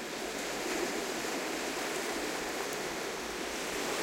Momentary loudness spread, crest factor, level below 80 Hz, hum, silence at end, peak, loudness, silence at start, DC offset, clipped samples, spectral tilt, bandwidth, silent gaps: 3 LU; 16 dB; -62 dBFS; none; 0 s; -20 dBFS; -35 LUFS; 0 s; under 0.1%; under 0.1%; -2 dB/octave; 16 kHz; none